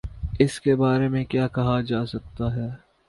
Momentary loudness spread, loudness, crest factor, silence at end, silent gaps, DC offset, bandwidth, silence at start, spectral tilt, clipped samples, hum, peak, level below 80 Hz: 11 LU; -24 LUFS; 20 dB; 0.3 s; none; under 0.1%; 11.5 kHz; 0.05 s; -7.5 dB/octave; under 0.1%; none; -4 dBFS; -40 dBFS